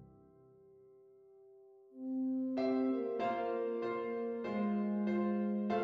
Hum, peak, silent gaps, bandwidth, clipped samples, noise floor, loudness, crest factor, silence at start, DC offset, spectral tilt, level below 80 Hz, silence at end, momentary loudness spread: none; -22 dBFS; none; 5.8 kHz; under 0.1%; -63 dBFS; -37 LUFS; 14 dB; 0 s; under 0.1%; -9 dB/octave; -78 dBFS; 0 s; 5 LU